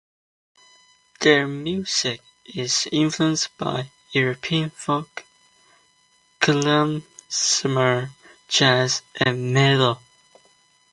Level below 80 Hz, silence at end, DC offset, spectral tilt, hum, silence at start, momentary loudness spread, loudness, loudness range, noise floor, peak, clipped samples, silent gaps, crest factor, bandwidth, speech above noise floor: -62 dBFS; 0.95 s; under 0.1%; -3.5 dB/octave; none; 1.2 s; 13 LU; -21 LUFS; 4 LU; -61 dBFS; 0 dBFS; under 0.1%; none; 22 dB; 11.5 kHz; 40 dB